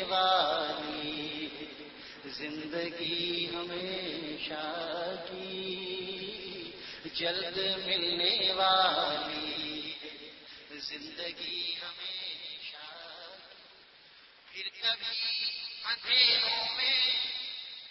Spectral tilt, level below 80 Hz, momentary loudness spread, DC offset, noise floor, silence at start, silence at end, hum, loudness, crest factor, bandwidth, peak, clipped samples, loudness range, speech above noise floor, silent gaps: -4.5 dB/octave; -68 dBFS; 19 LU; under 0.1%; -57 dBFS; 0 s; 0 s; none; -31 LUFS; 22 dB; 6 kHz; -12 dBFS; under 0.1%; 10 LU; 26 dB; none